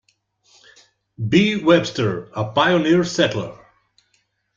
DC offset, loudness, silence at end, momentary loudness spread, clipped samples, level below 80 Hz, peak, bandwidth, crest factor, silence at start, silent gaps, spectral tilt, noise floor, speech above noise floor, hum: under 0.1%; -18 LUFS; 1 s; 12 LU; under 0.1%; -56 dBFS; -2 dBFS; 7.6 kHz; 18 dB; 1.2 s; none; -5.5 dB/octave; -67 dBFS; 49 dB; none